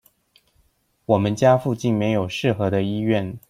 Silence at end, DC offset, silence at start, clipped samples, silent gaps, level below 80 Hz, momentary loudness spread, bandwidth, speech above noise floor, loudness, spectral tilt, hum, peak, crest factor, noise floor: 0.1 s; under 0.1%; 1.1 s; under 0.1%; none; -56 dBFS; 5 LU; 15.5 kHz; 44 dB; -21 LUFS; -7 dB/octave; none; -2 dBFS; 18 dB; -64 dBFS